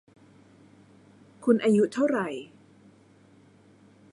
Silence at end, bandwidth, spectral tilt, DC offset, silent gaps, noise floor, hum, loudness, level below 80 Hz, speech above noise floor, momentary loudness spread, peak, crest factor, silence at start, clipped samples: 1.65 s; 11.5 kHz; -6.5 dB/octave; under 0.1%; none; -57 dBFS; none; -25 LUFS; -74 dBFS; 33 dB; 17 LU; -8 dBFS; 22 dB; 1.4 s; under 0.1%